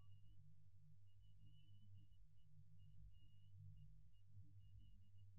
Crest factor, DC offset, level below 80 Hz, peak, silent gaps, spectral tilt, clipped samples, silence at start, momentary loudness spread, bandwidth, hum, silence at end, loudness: 14 dB; under 0.1%; -74 dBFS; -52 dBFS; none; -11.5 dB/octave; under 0.1%; 0 s; 4 LU; 3 kHz; none; 0 s; -68 LUFS